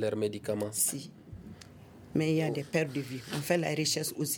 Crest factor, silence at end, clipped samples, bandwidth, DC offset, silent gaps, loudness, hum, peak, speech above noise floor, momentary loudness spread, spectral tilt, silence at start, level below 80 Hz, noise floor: 20 dB; 0 s; under 0.1%; over 20 kHz; under 0.1%; none; -31 LUFS; none; -14 dBFS; 20 dB; 20 LU; -4 dB/octave; 0 s; -64 dBFS; -52 dBFS